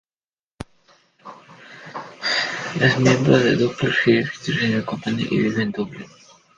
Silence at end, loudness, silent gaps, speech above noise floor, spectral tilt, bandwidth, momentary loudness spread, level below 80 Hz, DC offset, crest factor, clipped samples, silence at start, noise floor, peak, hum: 0.5 s; -20 LUFS; none; over 71 dB; -5.5 dB/octave; 10 kHz; 23 LU; -54 dBFS; under 0.1%; 20 dB; under 0.1%; 0.6 s; under -90 dBFS; -2 dBFS; none